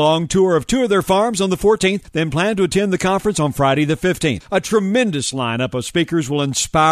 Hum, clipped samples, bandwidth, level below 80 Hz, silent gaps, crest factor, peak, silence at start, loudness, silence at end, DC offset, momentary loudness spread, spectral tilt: none; under 0.1%; 13.5 kHz; -42 dBFS; none; 16 dB; -2 dBFS; 0 s; -17 LUFS; 0 s; under 0.1%; 5 LU; -4.5 dB/octave